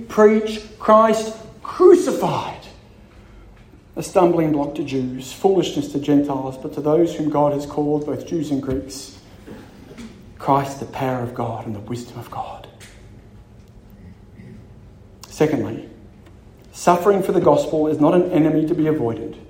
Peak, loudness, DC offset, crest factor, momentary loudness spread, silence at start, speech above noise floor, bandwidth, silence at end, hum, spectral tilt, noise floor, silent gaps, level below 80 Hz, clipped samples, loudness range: 0 dBFS; -19 LUFS; under 0.1%; 20 dB; 19 LU; 0 s; 27 dB; 16 kHz; 0.05 s; none; -6.5 dB/octave; -45 dBFS; none; -48 dBFS; under 0.1%; 11 LU